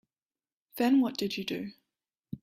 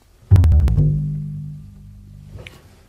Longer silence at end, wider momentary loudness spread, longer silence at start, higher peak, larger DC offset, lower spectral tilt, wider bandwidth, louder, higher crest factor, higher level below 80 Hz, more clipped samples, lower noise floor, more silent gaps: second, 0.05 s vs 0.4 s; second, 20 LU vs 25 LU; first, 0.75 s vs 0.3 s; second, -16 dBFS vs -2 dBFS; neither; second, -5 dB/octave vs -9 dB/octave; first, 15.5 kHz vs 5.8 kHz; second, -30 LUFS vs -17 LUFS; about the same, 16 dB vs 18 dB; second, -72 dBFS vs -24 dBFS; neither; first, under -90 dBFS vs -41 dBFS; neither